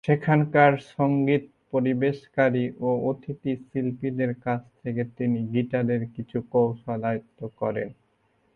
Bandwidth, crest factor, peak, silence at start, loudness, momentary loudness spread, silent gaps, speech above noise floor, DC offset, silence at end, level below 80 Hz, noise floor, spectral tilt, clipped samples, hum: 6.8 kHz; 18 dB; -6 dBFS; 0.05 s; -26 LUFS; 10 LU; none; 43 dB; under 0.1%; 0.65 s; -62 dBFS; -67 dBFS; -9.5 dB/octave; under 0.1%; none